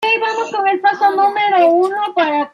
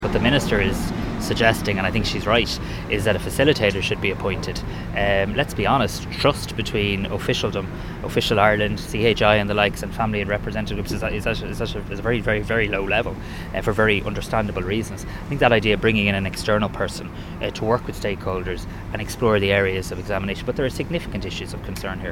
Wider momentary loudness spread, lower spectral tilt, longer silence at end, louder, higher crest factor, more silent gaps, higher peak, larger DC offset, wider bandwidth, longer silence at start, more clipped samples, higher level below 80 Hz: second, 5 LU vs 11 LU; second, -3.5 dB/octave vs -5.5 dB/octave; about the same, 0.05 s vs 0 s; first, -14 LUFS vs -22 LUFS; second, 12 dB vs 22 dB; neither; about the same, -2 dBFS vs 0 dBFS; neither; second, 11.5 kHz vs 17 kHz; about the same, 0 s vs 0 s; neither; second, -74 dBFS vs -34 dBFS